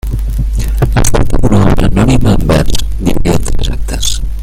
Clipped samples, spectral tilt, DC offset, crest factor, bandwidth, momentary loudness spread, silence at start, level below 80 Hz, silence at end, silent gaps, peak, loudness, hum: 0.2%; -5.5 dB/octave; under 0.1%; 8 dB; 16 kHz; 7 LU; 0.05 s; -14 dBFS; 0 s; none; 0 dBFS; -12 LUFS; none